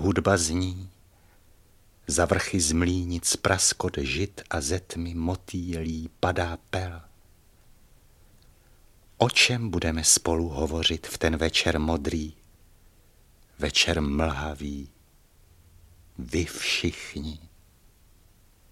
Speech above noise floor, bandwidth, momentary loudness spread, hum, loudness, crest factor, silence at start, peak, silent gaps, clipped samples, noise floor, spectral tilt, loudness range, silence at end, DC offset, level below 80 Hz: 32 dB; 15.5 kHz; 15 LU; none; -25 LUFS; 24 dB; 0 s; -4 dBFS; none; under 0.1%; -58 dBFS; -3.5 dB/octave; 9 LU; 1.25 s; under 0.1%; -42 dBFS